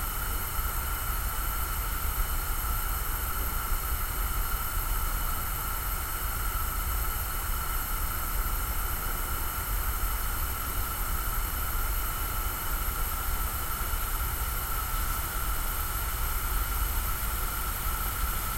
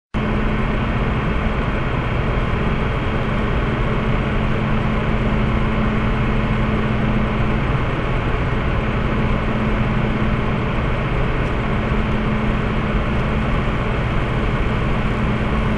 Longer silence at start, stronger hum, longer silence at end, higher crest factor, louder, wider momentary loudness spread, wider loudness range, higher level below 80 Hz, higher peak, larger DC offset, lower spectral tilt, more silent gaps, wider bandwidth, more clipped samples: second, 0 s vs 0.15 s; neither; about the same, 0 s vs 0 s; about the same, 14 dB vs 12 dB; second, -31 LUFS vs -20 LUFS; about the same, 1 LU vs 1 LU; about the same, 0 LU vs 1 LU; second, -32 dBFS vs -24 dBFS; second, -16 dBFS vs -6 dBFS; neither; second, -3 dB/octave vs -8 dB/octave; neither; first, 16 kHz vs 8.6 kHz; neither